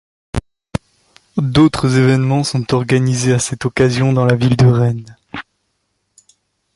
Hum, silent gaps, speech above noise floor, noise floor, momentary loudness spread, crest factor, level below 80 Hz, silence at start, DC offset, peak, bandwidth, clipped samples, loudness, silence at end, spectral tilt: 50 Hz at -55 dBFS; none; 55 dB; -68 dBFS; 15 LU; 14 dB; -38 dBFS; 0.35 s; under 0.1%; -2 dBFS; 11.5 kHz; under 0.1%; -14 LUFS; 1.35 s; -6 dB/octave